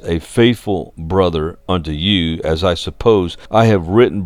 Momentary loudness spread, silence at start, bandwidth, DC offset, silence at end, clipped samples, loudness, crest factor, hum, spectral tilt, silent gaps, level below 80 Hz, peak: 8 LU; 0.05 s; 14.5 kHz; under 0.1%; 0 s; under 0.1%; -16 LUFS; 14 dB; none; -6.5 dB/octave; none; -34 dBFS; 0 dBFS